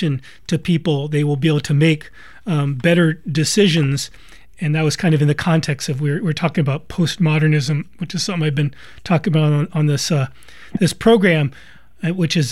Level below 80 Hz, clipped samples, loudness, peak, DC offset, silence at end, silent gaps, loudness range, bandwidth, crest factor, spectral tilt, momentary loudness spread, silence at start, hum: -48 dBFS; under 0.1%; -18 LUFS; -2 dBFS; 0.9%; 0 s; none; 2 LU; 12.5 kHz; 16 dB; -6 dB/octave; 9 LU; 0 s; none